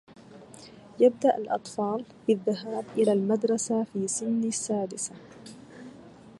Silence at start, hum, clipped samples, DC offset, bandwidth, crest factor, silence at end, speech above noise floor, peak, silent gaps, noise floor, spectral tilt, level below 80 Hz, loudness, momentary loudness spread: 0.1 s; none; under 0.1%; under 0.1%; 11.5 kHz; 20 dB; 0.1 s; 22 dB; -10 dBFS; none; -49 dBFS; -5 dB/octave; -72 dBFS; -27 LUFS; 23 LU